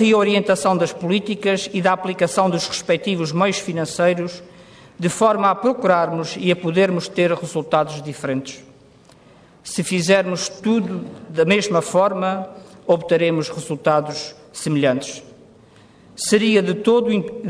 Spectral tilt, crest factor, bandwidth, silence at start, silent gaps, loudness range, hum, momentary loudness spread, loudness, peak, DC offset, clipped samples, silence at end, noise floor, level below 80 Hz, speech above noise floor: -5 dB/octave; 16 dB; 11 kHz; 0 s; none; 3 LU; none; 11 LU; -19 LUFS; -4 dBFS; under 0.1%; under 0.1%; 0 s; -49 dBFS; -62 dBFS; 30 dB